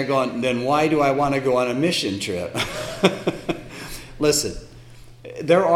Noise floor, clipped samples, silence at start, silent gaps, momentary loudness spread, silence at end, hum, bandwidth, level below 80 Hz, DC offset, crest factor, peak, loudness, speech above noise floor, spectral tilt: -43 dBFS; under 0.1%; 0 s; none; 13 LU; 0 s; none; 17 kHz; -46 dBFS; under 0.1%; 20 dB; 0 dBFS; -21 LUFS; 22 dB; -4.5 dB/octave